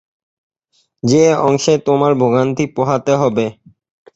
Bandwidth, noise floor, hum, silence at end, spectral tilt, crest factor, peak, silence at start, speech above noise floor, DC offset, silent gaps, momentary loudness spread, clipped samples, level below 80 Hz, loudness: 8 kHz; -62 dBFS; none; 0.65 s; -6 dB/octave; 14 dB; -2 dBFS; 1.05 s; 49 dB; under 0.1%; none; 7 LU; under 0.1%; -54 dBFS; -14 LUFS